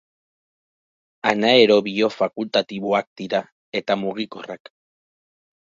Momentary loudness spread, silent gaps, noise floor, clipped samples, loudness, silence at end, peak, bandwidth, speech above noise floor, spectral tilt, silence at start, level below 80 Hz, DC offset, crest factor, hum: 16 LU; 3.07-3.16 s, 3.52-3.72 s; under -90 dBFS; under 0.1%; -20 LUFS; 1.2 s; -2 dBFS; 7.6 kHz; over 70 dB; -5 dB/octave; 1.25 s; -68 dBFS; under 0.1%; 20 dB; none